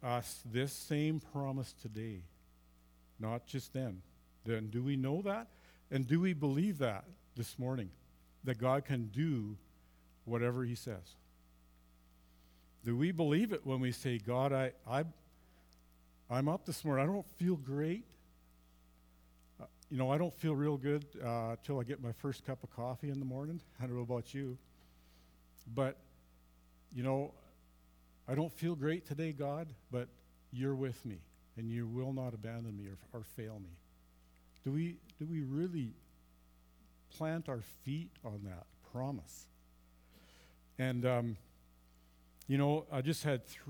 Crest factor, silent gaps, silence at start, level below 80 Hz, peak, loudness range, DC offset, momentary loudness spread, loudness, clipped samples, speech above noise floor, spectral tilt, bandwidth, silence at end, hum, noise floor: 20 dB; none; 0 s; -68 dBFS; -20 dBFS; 7 LU; under 0.1%; 15 LU; -39 LUFS; under 0.1%; 28 dB; -7 dB/octave; over 20 kHz; 0 s; none; -66 dBFS